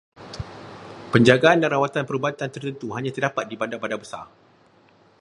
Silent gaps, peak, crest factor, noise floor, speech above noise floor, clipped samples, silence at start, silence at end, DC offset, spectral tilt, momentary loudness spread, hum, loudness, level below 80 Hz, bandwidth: none; 0 dBFS; 24 dB; -56 dBFS; 35 dB; under 0.1%; 0.2 s; 0.95 s; under 0.1%; -6 dB/octave; 22 LU; none; -22 LUFS; -54 dBFS; 11 kHz